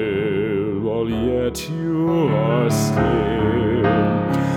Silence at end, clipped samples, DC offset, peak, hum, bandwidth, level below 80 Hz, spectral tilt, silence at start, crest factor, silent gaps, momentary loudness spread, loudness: 0 s; under 0.1%; under 0.1%; -4 dBFS; none; 17 kHz; -38 dBFS; -7 dB/octave; 0 s; 14 dB; none; 5 LU; -20 LUFS